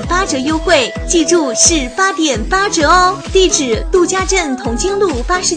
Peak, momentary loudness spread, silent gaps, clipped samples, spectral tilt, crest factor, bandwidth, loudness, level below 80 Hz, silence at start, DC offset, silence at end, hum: 0 dBFS; 6 LU; none; under 0.1%; -2.5 dB/octave; 12 dB; 10 kHz; -12 LUFS; -26 dBFS; 0 s; under 0.1%; 0 s; none